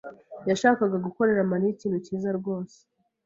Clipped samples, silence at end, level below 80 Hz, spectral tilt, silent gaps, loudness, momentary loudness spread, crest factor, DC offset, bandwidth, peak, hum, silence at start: under 0.1%; 0.6 s; -68 dBFS; -6.5 dB/octave; none; -26 LUFS; 12 LU; 20 dB; under 0.1%; 7.8 kHz; -6 dBFS; none; 0.05 s